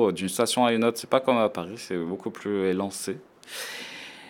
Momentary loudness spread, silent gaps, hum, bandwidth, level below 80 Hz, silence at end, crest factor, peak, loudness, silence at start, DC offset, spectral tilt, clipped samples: 14 LU; none; none; 18 kHz; -74 dBFS; 0 s; 20 dB; -6 dBFS; -26 LUFS; 0 s; under 0.1%; -4 dB/octave; under 0.1%